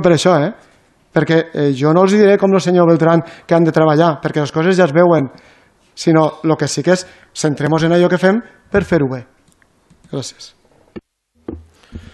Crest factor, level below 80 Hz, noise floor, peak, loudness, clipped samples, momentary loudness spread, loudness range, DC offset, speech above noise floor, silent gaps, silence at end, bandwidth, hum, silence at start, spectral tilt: 14 dB; -46 dBFS; -54 dBFS; 0 dBFS; -14 LUFS; under 0.1%; 15 LU; 8 LU; under 0.1%; 41 dB; none; 0.15 s; 12 kHz; none; 0 s; -6.5 dB/octave